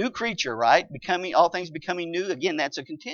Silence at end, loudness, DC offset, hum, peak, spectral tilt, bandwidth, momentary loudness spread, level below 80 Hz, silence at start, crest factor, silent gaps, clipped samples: 0 s; -25 LUFS; under 0.1%; none; -4 dBFS; -3.5 dB/octave; 7.4 kHz; 10 LU; -66 dBFS; 0 s; 22 dB; none; under 0.1%